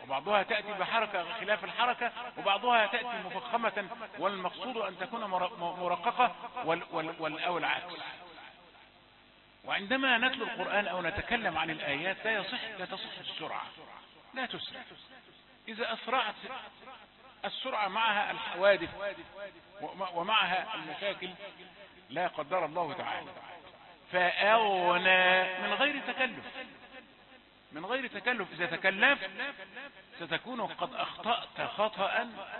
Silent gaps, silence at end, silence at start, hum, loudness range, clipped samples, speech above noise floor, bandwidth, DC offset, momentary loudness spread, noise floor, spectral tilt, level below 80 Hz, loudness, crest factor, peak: none; 0 s; 0 s; none; 9 LU; under 0.1%; 28 dB; 4.3 kHz; under 0.1%; 20 LU; -60 dBFS; -0.5 dB/octave; -68 dBFS; -31 LUFS; 24 dB; -10 dBFS